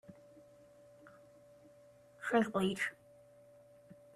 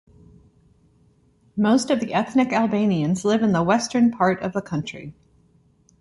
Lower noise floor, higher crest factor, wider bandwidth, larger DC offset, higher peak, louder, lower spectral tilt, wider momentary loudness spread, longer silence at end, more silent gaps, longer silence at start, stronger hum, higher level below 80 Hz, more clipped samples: about the same, -62 dBFS vs -59 dBFS; first, 24 dB vs 18 dB; first, 14.5 kHz vs 11.5 kHz; neither; second, -18 dBFS vs -4 dBFS; second, -35 LUFS vs -21 LUFS; about the same, -5.5 dB/octave vs -6 dB/octave; first, 27 LU vs 11 LU; second, 0.25 s vs 0.9 s; neither; second, 0.1 s vs 1.55 s; neither; second, -76 dBFS vs -58 dBFS; neither